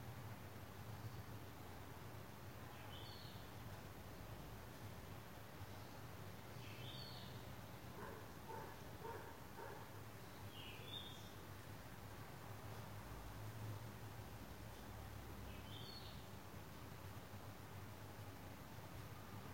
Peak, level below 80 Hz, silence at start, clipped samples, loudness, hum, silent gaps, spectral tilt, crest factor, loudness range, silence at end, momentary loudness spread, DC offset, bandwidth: -40 dBFS; -66 dBFS; 0 s; under 0.1%; -55 LUFS; none; none; -5 dB/octave; 16 dB; 1 LU; 0 s; 4 LU; under 0.1%; 16.5 kHz